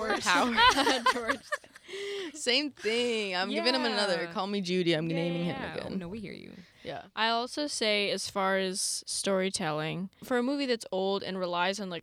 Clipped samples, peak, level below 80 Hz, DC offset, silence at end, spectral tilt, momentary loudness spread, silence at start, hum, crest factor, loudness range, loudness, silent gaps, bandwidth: under 0.1%; -8 dBFS; -62 dBFS; under 0.1%; 0 s; -3 dB/octave; 12 LU; 0 s; none; 22 dB; 4 LU; -29 LUFS; none; 16.5 kHz